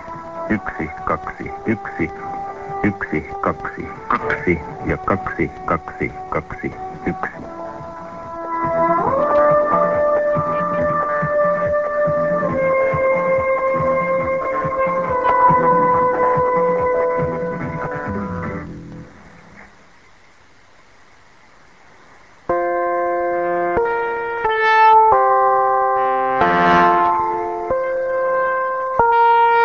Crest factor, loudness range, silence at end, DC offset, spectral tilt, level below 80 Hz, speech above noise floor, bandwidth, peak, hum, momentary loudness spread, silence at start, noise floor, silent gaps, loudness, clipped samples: 18 dB; 10 LU; 0 s; 0.3%; -7.5 dB/octave; -44 dBFS; 28 dB; 7.4 kHz; 0 dBFS; none; 14 LU; 0 s; -50 dBFS; none; -18 LUFS; under 0.1%